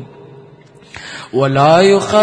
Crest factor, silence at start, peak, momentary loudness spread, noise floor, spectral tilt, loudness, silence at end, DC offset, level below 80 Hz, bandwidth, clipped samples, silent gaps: 14 dB; 0 s; 0 dBFS; 21 LU; -42 dBFS; -5.5 dB/octave; -11 LUFS; 0 s; under 0.1%; -52 dBFS; 10 kHz; 0.1%; none